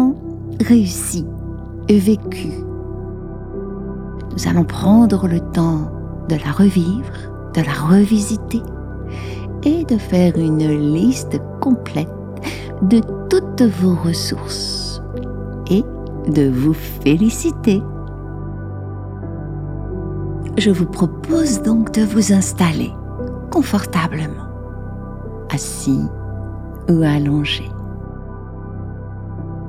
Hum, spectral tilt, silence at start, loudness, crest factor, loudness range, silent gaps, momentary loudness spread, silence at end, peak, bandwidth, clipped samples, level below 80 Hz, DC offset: none; -6 dB/octave; 0 s; -18 LUFS; 16 dB; 5 LU; none; 15 LU; 0 s; -2 dBFS; 16 kHz; under 0.1%; -34 dBFS; under 0.1%